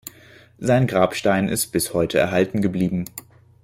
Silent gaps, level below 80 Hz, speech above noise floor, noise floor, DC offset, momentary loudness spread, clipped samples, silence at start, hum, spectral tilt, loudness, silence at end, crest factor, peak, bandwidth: none; -52 dBFS; 29 dB; -49 dBFS; under 0.1%; 10 LU; under 0.1%; 0.05 s; none; -5.5 dB/octave; -21 LUFS; 0.45 s; 16 dB; -4 dBFS; 16.5 kHz